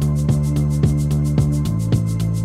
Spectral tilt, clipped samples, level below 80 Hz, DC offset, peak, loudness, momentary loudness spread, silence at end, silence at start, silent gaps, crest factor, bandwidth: -8 dB/octave; under 0.1%; -28 dBFS; under 0.1%; -4 dBFS; -19 LUFS; 2 LU; 0 s; 0 s; none; 14 dB; 14 kHz